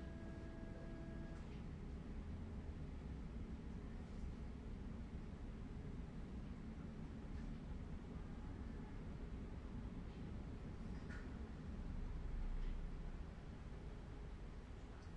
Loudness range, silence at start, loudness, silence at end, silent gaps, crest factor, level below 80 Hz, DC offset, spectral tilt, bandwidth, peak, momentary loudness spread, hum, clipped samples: 1 LU; 0 s; -53 LUFS; 0 s; none; 14 dB; -52 dBFS; under 0.1%; -8 dB/octave; 9.4 kHz; -36 dBFS; 3 LU; none; under 0.1%